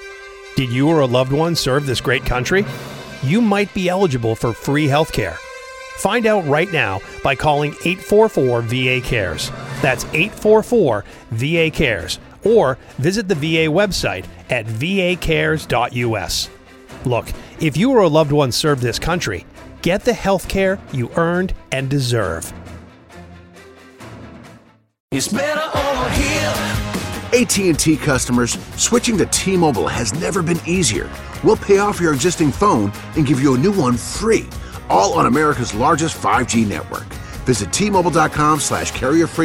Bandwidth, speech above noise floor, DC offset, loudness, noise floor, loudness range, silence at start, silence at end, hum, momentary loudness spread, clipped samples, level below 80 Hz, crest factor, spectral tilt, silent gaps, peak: 17 kHz; 30 dB; under 0.1%; -17 LUFS; -47 dBFS; 4 LU; 0 s; 0 s; none; 10 LU; under 0.1%; -36 dBFS; 16 dB; -4.5 dB/octave; 25.00-25.08 s; -2 dBFS